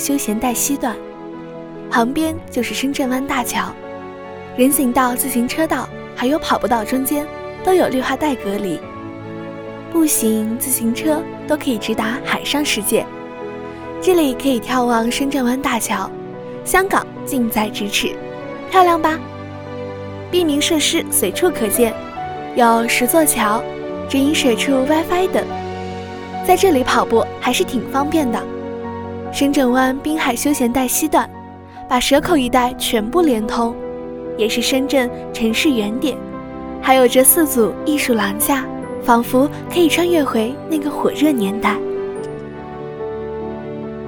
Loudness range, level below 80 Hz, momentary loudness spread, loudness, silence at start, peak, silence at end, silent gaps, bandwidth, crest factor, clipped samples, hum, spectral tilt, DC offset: 4 LU; -44 dBFS; 15 LU; -17 LUFS; 0 s; 0 dBFS; 0 s; none; over 20 kHz; 18 dB; under 0.1%; none; -3.5 dB/octave; under 0.1%